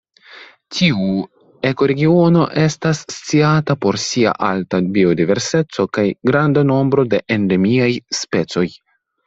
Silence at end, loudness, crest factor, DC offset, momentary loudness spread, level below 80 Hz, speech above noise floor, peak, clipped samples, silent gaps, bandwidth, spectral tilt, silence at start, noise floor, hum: 0.5 s; -16 LUFS; 14 dB; under 0.1%; 7 LU; -52 dBFS; 26 dB; -2 dBFS; under 0.1%; none; 8 kHz; -6 dB/octave; 0.35 s; -42 dBFS; none